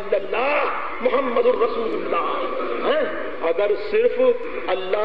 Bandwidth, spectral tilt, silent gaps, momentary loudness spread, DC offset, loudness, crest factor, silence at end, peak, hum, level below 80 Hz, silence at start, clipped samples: 5.4 kHz; -7 dB/octave; none; 6 LU; 3%; -22 LUFS; 14 dB; 0 s; -6 dBFS; none; -54 dBFS; 0 s; under 0.1%